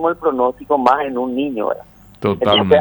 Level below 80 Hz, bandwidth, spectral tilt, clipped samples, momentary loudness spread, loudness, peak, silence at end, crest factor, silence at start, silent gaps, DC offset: -50 dBFS; over 20 kHz; -7 dB/octave; under 0.1%; 8 LU; -17 LUFS; 0 dBFS; 0 s; 16 dB; 0 s; none; under 0.1%